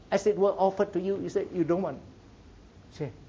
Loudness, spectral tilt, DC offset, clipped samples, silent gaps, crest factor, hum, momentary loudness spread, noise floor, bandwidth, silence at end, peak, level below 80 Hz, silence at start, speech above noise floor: -28 LUFS; -7 dB/octave; under 0.1%; under 0.1%; none; 16 dB; none; 14 LU; -52 dBFS; 7.8 kHz; 0.05 s; -12 dBFS; -58 dBFS; 0.1 s; 24 dB